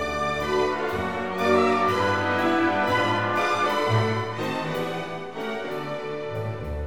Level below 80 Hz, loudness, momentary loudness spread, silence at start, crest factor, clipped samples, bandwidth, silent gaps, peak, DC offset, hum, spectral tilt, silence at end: -46 dBFS; -25 LUFS; 10 LU; 0 s; 18 dB; under 0.1%; 19 kHz; none; -6 dBFS; 0.5%; none; -5.5 dB/octave; 0 s